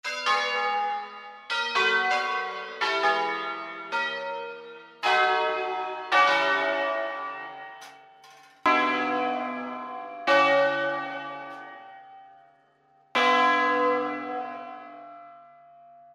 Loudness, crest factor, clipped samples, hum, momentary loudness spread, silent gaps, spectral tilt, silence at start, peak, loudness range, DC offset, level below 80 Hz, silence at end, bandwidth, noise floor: -25 LUFS; 18 dB; under 0.1%; none; 20 LU; none; -2.5 dB/octave; 0.05 s; -8 dBFS; 3 LU; under 0.1%; -80 dBFS; 0.7 s; 13 kHz; -62 dBFS